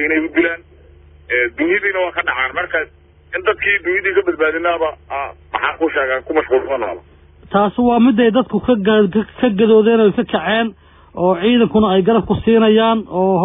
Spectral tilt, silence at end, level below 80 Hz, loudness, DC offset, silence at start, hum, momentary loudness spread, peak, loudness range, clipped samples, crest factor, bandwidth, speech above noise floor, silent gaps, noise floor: -10 dB/octave; 0 s; -46 dBFS; -15 LUFS; under 0.1%; 0 s; none; 10 LU; -2 dBFS; 5 LU; under 0.1%; 12 dB; 3.8 kHz; 29 dB; none; -44 dBFS